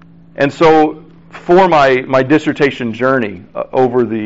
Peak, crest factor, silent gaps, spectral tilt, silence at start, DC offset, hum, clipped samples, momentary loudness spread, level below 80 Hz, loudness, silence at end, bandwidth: -2 dBFS; 12 dB; none; -4.5 dB/octave; 0.4 s; under 0.1%; none; under 0.1%; 9 LU; -48 dBFS; -12 LUFS; 0 s; 8 kHz